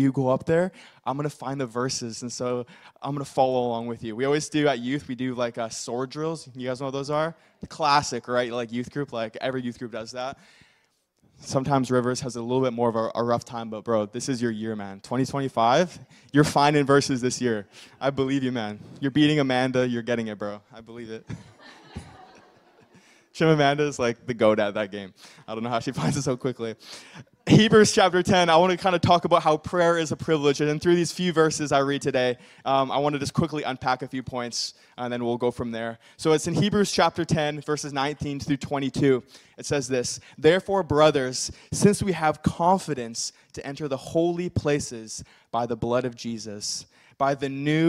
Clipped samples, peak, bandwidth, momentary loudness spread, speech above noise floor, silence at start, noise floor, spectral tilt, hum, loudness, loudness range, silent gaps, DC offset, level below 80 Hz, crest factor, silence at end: under 0.1%; -4 dBFS; 14.5 kHz; 14 LU; 43 dB; 0 s; -68 dBFS; -5 dB/octave; none; -25 LUFS; 7 LU; none; under 0.1%; -56 dBFS; 20 dB; 0 s